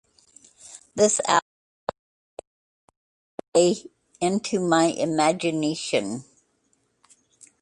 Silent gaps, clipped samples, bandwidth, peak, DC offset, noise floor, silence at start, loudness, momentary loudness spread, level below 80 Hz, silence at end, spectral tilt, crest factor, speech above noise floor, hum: 1.42-1.87 s, 1.99-2.37 s, 2.47-2.88 s, 2.97-3.38 s, 3.48-3.52 s; under 0.1%; 11.5 kHz; -6 dBFS; under 0.1%; -69 dBFS; 0.65 s; -23 LUFS; 23 LU; -66 dBFS; 1.4 s; -4 dB/octave; 20 dB; 47 dB; none